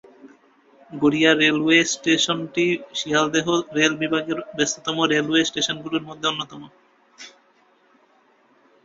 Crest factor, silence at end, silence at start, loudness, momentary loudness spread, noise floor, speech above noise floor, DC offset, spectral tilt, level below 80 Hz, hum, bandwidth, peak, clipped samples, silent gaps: 20 dB; 1.55 s; 0.25 s; -20 LUFS; 10 LU; -59 dBFS; 38 dB; under 0.1%; -3 dB/octave; -64 dBFS; none; 8 kHz; -2 dBFS; under 0.1%; none